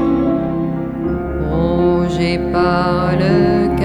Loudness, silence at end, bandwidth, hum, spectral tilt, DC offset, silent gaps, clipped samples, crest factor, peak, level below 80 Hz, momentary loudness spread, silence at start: -16 LUFS; 0 s; 9.6 kHz; none; -8 dB/octave; under 0.1%; none; under 0.1%; 14 dB; -2 dBFS; -30 dBFS; 7 LU; 0 s